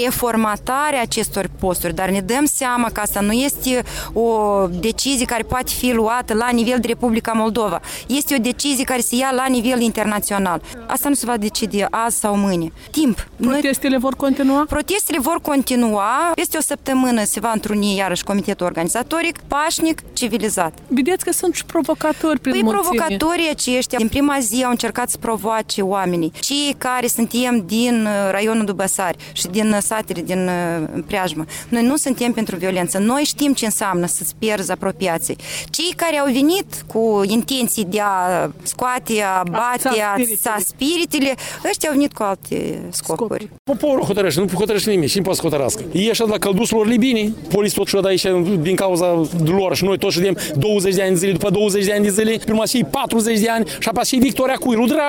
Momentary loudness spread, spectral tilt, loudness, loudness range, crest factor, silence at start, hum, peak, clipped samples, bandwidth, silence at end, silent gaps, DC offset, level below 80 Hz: 5 LU; -4 dB/octave; -18 LUFS; 2 LU; 18 dB; 0 s; none; 0 dBFS; under 0.1%; 19 kHz; 0 s; 43.59-43.65 s; under 0.1%; -42 dBFS